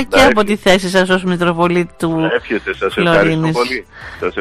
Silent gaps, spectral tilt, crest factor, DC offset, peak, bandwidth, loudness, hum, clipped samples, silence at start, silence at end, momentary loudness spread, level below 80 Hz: none; -5 dB/octave; 14 dB; under 0.1%; 0 dBFS; 15.5 kHz; -14 LUFS; none; under 0.1%; 0 s; 0 s; 9 LU; -36 dBFS